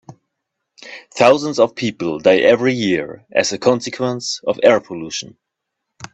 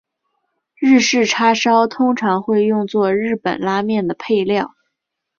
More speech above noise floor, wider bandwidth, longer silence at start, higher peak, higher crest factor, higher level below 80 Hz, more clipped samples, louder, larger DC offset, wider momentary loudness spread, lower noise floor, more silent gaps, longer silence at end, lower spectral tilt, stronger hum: about the same, 62 dB vs 62 dB; first, 8.2 kHz vs 7.4 kHz; about the same, 0.85 s vs 0.8 s; about the same, 0 dBFS vs -2 dBFS; about the same, 18 dB vs 14 dB; about the same, -60 dBFS vs -60 dBFS; neither; about the same, -16 LUFS vs -16 LUFS; neither; first, 14 LU vs 7 LU; about the same, -78 dBFS vs -78 dBFS; neither; second, 0.1 s vs 0.7 s; about the same, -4 dB/octave vs -4.5 dB/octave; neither